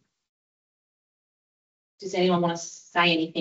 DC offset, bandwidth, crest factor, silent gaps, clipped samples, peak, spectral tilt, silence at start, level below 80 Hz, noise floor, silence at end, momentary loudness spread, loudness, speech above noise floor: under 0.1%; 8 kHz; 20 dB; none; under 0.1%; -10 dBFS; -3 dB/octave; 2 s; -74 dBFS; under -90 dBFS; 0 s; 12 LU; -24 LUFS; over 65 dB